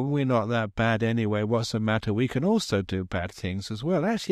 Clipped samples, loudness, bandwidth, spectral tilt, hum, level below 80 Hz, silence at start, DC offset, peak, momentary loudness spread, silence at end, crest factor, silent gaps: under 0.1%; -26 LUFS; 13.5 kHz; -6.5 dB/octave; none; -52 dBFS; 0 s; under 0.1%; -12 dBFS; 7 LU; 0 s; 14 dB; none